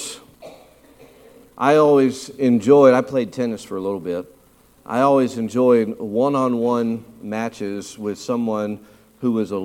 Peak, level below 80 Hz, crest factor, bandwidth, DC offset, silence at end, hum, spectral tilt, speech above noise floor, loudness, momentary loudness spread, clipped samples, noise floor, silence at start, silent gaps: -2 dBFS; -62 dBFS; 18 dB; 15.5 kHz; under 0.1%; 0 s; none; -6.5 dB/octave; 35 dB; -19 LUFS; 15 LU; under 0.1%; -53 dBFS; 0 s; none